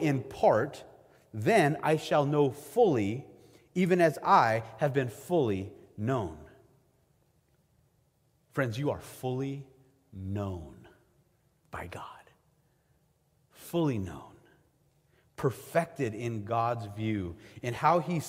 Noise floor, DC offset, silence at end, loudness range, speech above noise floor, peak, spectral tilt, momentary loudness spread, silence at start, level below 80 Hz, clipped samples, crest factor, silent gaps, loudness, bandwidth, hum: -70 dBFS; under 0.1%; 0 s; 13 LU; 41 dB; -10 dBFS; -6.5 dB/octave; 19 LU; 0 s; -64 dBFS; under 0.1%; 22 dB; none; -30 LUFS; 16 kHz; none